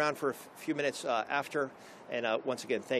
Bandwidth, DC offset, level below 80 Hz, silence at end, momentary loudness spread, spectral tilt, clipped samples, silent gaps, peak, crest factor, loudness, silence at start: 14 kHz; under 0.1%; -84 dBFS; 0 s; 8 LU; -4 dB/octave; under 0.1%; none; -16 dBFS; 18 dB; -34 LUFS; 0 s